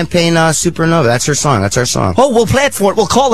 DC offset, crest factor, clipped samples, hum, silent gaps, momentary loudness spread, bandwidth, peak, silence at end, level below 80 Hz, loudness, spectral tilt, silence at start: 3%; 12 dB; under 0.1%; none; none; 3 LU; 14.5 kHz; 0 dBFS; 0 s; -36 dBFS; -11 LUFS; -4.5 dB/octave; 0 s